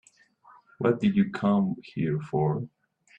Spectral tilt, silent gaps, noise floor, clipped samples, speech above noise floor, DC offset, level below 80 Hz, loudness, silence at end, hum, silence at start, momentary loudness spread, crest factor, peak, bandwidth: -9 dB/octave; none; -58 dBFS; under 0.1%; 32 dB; under 0.1%; -64 dBFS; -27 LUFS; 0.5 s; none; 0.8 s; 7 LU; 18 dB; -10 dBFS; 8.2 kHz